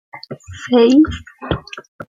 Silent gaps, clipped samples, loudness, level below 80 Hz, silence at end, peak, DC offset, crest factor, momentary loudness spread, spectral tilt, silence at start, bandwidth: 1.88-1.99 s; under 0.1%; -15 LUFS; -40 dBFS; 0.1 s; -2 dBFS; under 0.1%; 14 dB; 22 LU; -6.5 dB/octave; 0.15 s; 7.6 kHz